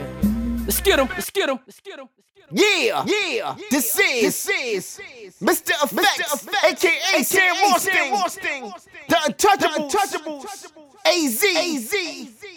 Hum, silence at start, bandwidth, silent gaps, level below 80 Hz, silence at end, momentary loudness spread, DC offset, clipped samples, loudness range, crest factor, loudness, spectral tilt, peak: none; 0 s; over 20 kHz; none; -42 dBFS; 0 s; 16 LU; under 0.1%; under 0.1%; 3 LU; 18 dB; -19 LUFS; -2.5 dB/octave; -4 dBFS